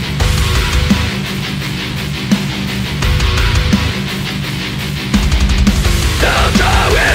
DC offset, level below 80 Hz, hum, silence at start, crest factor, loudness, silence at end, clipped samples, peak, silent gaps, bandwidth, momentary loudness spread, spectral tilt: under 0.1%; -18 dBFS; none; 0 s; 12 dB; -14 LUFS; 0 s; under 0.1%; 0 dBFS; none; 16 kHz; 8 LU; -4.5 dB/octave